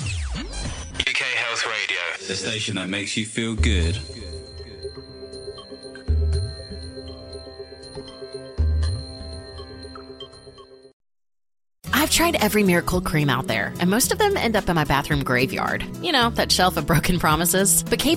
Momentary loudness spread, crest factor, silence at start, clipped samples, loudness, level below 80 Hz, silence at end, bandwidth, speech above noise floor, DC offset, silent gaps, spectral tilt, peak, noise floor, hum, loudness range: 20 LU; 20 dB; 0 s; under 0.1%; -21 LUFS; -32 dBFS; 0 s; 16 kHz; 24 dB; under 0.1%; 10.93-11.00 s; -3.5 dB/octave; -4 dBFS; -45 dBFS; none; 11 LU